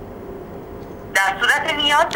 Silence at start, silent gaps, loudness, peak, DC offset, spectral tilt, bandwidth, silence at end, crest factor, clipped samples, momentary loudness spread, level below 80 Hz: 0 s; none; -17 LUFS; -4 dBFS; under 0.1%; -2 dB/octave; 19.5 kHz; 0 s; 16 dB; under 0.1%; 19 LU; -46 dBFS